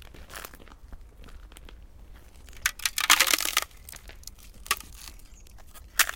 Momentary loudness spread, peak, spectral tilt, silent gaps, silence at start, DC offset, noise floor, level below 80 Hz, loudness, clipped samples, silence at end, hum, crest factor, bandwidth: 26 LU; -2 dBFS; 1 dB/octave; none; 0 s; under 0.1%; -48 dBFS; -48 dBFS; -24 LUFS; under 0.1%; 0 s; none; 28 dB; 17 kHz